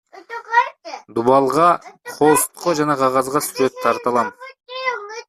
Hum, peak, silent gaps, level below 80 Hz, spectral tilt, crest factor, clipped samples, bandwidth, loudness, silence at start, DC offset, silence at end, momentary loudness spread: none; -2 dBFS; none; -60 dBFS; -4 dB/octave; 16 dB; under 0.1%; 15 kHz; -18 LUFS; 0.15 s; under 0.1%; 0.05 s; 13 LU